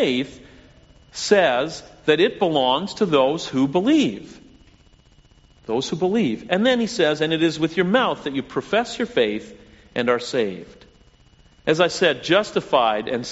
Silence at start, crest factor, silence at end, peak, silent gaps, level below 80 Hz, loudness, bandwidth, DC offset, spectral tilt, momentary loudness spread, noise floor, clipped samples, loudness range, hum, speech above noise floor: 0 s; 20 dB; 0 s; -2 dBFS; none; -56 dBFS; -21 LUFS; 8 kHz; under 0.1%; -3 dB/octave; 10 LU; -53 dBFS; under 0.1%; 4 LU; none; 33 dB